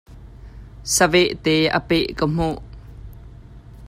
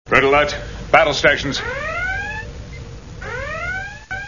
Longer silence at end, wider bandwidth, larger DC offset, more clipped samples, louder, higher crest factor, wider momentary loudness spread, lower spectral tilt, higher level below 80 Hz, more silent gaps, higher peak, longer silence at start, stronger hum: about the same, 0 s vs 0 s; first, 15.5 kHz vs 7.4 kHz; second, under 0.1% vs 0.4%; neither; about the same, -19 LUFS vs -18 LUFS; about the same, 18 dB vs 20 dB; first, 25 LU vs 20 LU; about the same, -4 dB/octave vs -4 dB/octave; about the same, -40 dBFS vs -36 dBFS; neither; second, -4 dBFS vs 0 dBFS; about the same, 0.1 s vs 0.05 s; neither